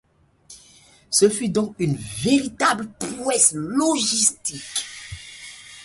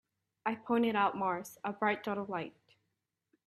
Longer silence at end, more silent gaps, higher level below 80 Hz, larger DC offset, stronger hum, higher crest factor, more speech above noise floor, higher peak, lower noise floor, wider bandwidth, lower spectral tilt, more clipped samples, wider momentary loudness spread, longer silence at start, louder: second, 0 s vs 1 s; neither; first, -54 dBFS vs -80 dBFS; neither; neither; about the same, 20 dB vs 20 dB; second, 31 dB vs 51 dB; first, -2 dBFS vs -16 dBFS; second, -52 dBFS vs -85 dBFS; second, 12 kHz vs 13.5 kHz; second, -3 dB/octave vs -5.5 dB/octave; neither; first, 19 LU vs 10 LU; about the same, 0.5 s vs 0.45 s; first, -20 LUFS vs -34 LUFS